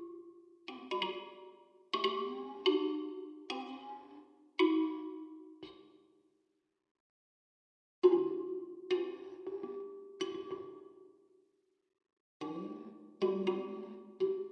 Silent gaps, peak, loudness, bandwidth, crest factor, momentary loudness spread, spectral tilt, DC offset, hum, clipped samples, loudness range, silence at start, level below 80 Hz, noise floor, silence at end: 6.91-8.02 s, 12.13-12.40 s; -14 dBFS; -37 LUFS; 8.4 kHz; 24 dB; 22 LU; -5.5 dB/octave; under 0.1%; none; under 0.1%; 10 LU; 0 s; -90 dBFS; -80 dBFS; 0 s